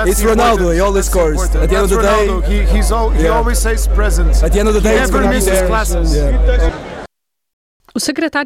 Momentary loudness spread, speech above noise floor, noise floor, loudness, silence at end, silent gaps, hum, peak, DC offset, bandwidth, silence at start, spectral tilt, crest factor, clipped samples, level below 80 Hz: 5 LU; 29 dB; -40 dBFS; -14 LUFS; 0 s; 7.53-7.80 s; none; -2 dBFS; under 0.1%; 16 kHz; 0 s; -5 dB/octave; 10 dB; under 0.1%; -14 dBFS